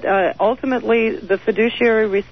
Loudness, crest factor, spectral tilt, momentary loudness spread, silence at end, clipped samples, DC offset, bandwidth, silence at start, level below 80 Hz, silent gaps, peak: -17 LUFS; 12 dB; -7 dB/octave; 4 LU; 0.1 s; under 0.1%; 0.5%; 6.2 kHz; 0 s; -50 dBFS; none; -4 dBFS